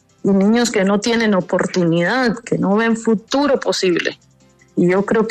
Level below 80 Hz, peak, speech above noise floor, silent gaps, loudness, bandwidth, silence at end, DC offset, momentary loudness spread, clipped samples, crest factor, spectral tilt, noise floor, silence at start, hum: -54 dBFS; -4 dBFS; 36 dB; none; -17 LUFS; 13 kHz; 0 s; under 0.1%; 4 LU; under 0.1%; 12 dB; -5.5 dB/octave; -51 dBFS; 0.25 s; none